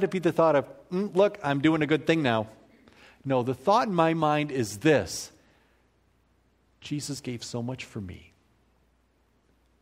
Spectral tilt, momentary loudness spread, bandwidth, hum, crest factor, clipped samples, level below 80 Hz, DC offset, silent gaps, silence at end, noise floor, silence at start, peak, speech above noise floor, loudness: -5.5 dB/octave; 14 LU; 16 kHz; none; 20 dB; under 0.1%; -62 dBFS; under 0.1%; none; 1.6 s; -67 dBFS; 0 s; -8 dBFS; 41 dB; -26 LUFS